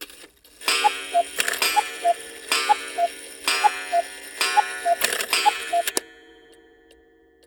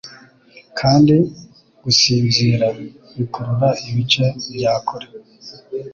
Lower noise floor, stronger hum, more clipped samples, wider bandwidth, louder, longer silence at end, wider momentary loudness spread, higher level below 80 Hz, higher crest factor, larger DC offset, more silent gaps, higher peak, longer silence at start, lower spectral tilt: first, -56 dBFS vs -47 dBFS; neither; neither; first, over 20 kHz vs 7.4 kHz; second, -22 LUFS vs -16 LUFS; first, 1.35 s vs 0 s; second, 7 LU vs 21 LU; second, -66 dBFS vs -50 dBFS; about the same, 22 dB vs 18 dB; neither; neither; about the same, -2 dBFS vs -2 dBFS; about the same, 0 s vs 0.05 s; second, 1 dB/octave vs -5 dB/octave